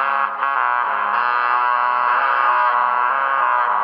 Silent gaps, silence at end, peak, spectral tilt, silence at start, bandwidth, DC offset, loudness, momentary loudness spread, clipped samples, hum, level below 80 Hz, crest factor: none; 0 s; -4 dBFS; -3.5 dB/octave; 0 s; 5.4 kHz; under 0.1%; -17 LUFS; 3 LU; under 0.1%; none; -84 dBFS; 14 dB